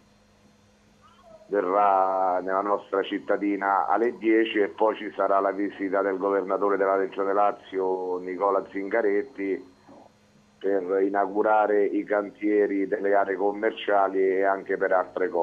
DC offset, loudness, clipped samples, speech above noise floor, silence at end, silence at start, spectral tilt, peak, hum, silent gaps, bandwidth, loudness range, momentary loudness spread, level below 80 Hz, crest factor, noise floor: under 0.1%; -25 LUFS; under 0.1%; 35 dB; 0 s; 1.5 s; -7 dB/octave; -10 dBFS; none; none; 7 kHz; 3 LU; 6 LU; -72 dBFS; 16 dB; -59 dBFS